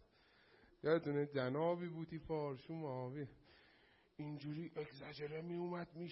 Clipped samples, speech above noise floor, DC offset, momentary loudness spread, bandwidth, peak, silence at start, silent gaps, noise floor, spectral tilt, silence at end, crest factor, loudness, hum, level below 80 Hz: under 0.1%; 29 dB; under 0.1%; 12 LU; 5.6 kHz; -24 dBFS; 0.85 s; none; -72 dBFS; -6 dB/octave; 0 s; 20 dB; -44 LUFS; none; -74 dBFS